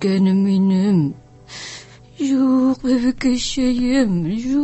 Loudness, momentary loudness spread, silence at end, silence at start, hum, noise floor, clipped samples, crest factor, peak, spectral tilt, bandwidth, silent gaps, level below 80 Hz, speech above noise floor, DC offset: -18 LUFS; 16 LU; 0 s; 0 s; none; -39 dBFS; under 0.1%; 12 dB; -6 dBFS; -6.5 dB/octave; 8.4 kHz; none; -44 dBFS; 23 dB; under 0.1%